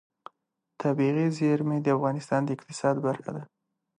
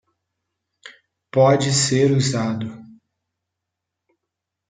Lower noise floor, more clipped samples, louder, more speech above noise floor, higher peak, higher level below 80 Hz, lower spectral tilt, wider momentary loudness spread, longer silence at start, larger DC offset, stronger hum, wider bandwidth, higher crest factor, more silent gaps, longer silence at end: about the same, -79 dBFS vs -82 dBFS; neither; second, -27 LUFS vs -18 LUFS; second, 52 dB vs 65 dB; second, -12 dBFS vs -4 dBFS; second, -76 dBFS vs -62 dBFS; first, -7.5 dB/octave vs -5 dB/octave; second, 8 LU vs 11 LU; about the same, 0.8 s vs 0.85 s; neither; neither; first, 11 kHz vs 9.6 kHz; about the same, 16 dB vs 18 dB; neither; second, 0.55 s vs 1.85 s